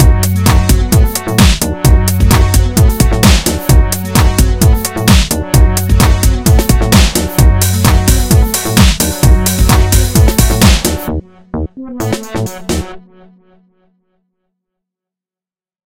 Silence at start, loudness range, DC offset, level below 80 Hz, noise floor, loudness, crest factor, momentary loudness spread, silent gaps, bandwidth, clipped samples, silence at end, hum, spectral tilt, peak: 0 s; 12 LU; under 0.1%; -14 dBFS; under -90 dBFS; -10 LUFS; 10 dB; 10 LU; none; 17 kHz; 1%; 2.9 s; none; -4.5 dB/octave; 0 dBFS